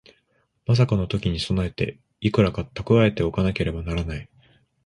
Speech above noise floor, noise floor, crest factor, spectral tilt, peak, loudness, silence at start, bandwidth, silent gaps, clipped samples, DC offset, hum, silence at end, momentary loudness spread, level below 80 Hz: 46 dB; -68 dBFS; 18 dB; -7.5 dB/octave; -4 dBFS; -23 LUFS; 0.7 s; 11 kHz; none; under 0.1%; under 0.1%; none; 0.6 s; 11 LU; -38 dBFS